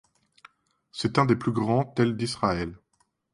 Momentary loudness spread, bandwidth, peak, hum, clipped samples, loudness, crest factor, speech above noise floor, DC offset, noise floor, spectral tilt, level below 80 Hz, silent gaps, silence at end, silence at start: 9 LU; 11.5 kHz; -8 dBFS; none; under 0.1%; -26 LUFS; 20 dB; 46 dB; under 0.1%; -71 dBFS; -6.5 dB/octave; -54 dBFS; none; 0.55 s; 0.95 s